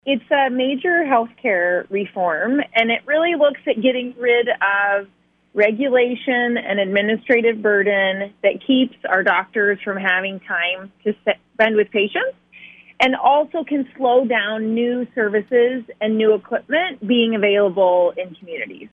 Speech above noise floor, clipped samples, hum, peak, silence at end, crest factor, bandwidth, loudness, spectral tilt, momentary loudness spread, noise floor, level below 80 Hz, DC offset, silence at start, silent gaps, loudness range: 26 dB; under 0.1%; none; -2 dBFS; 0.05 s; 16 dB; 6.8 kHz; -18 LUFS; -6.5 dB/octave; 7 LU; -44 dBFS; -68 dBFS; under 0.1%; 0.05 s; none; 2 LU